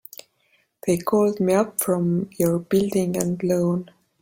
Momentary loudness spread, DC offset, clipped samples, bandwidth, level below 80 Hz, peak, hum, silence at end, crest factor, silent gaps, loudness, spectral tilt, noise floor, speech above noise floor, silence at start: 7 LU; under 0.1%; under 0.1%; 17 kHz; -58 dBFS; -4 dBFS; none; 0.4 s; 18 dB; none; -22 LUFS; -6.5 dB/octave; -65 dBFS; 44 dB; 0.85 s